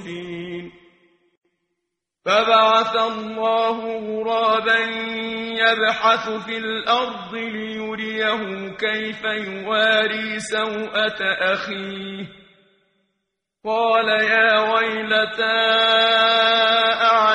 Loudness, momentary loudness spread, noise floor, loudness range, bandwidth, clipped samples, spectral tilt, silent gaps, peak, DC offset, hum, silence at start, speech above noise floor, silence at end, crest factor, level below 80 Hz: -19 LUFS; 14 LU; -80 dBFS; 7 LU; 10.5 kHz; under 0.1%; -3 dB/octave; 1.37-1.41 s; -2 dBFS; under 0.1%; none; 0 s; 60 dB; 0 s; 18 dB; -62 dBFS